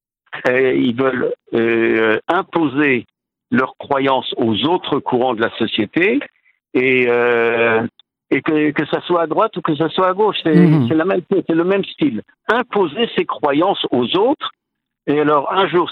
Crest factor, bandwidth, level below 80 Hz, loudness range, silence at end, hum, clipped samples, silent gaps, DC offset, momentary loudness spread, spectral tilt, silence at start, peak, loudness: 16 dB; 6.2 kHz; -62 dBFS; 2 LU; 0 s; none; under 0.1%; none; under 0.1%; 6 LU; -8 dB/octave; 0.3 s; 0 dBFS; -16 LUFS